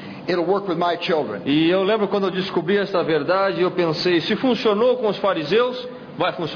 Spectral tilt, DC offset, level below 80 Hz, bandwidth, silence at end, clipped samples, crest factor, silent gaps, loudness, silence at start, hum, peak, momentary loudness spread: -6.5 dB/octave; under 0.1%; -60 dBFS; 5.4 kHz; 0 s; under 0.1%; 14 dB; none; -20 LUFS; 0 s; none; -6 dBFS; 5 LU